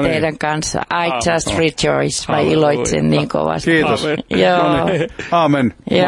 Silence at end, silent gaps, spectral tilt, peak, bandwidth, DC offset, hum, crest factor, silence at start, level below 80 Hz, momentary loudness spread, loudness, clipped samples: 0 s; none; -4.5 dB/octave; -2 dBFS; 11.5 kHz; under 0.1%; none; 14 dB; 0 s; -40 dBFS; 5 LU; -16 LUFS; under 0.1%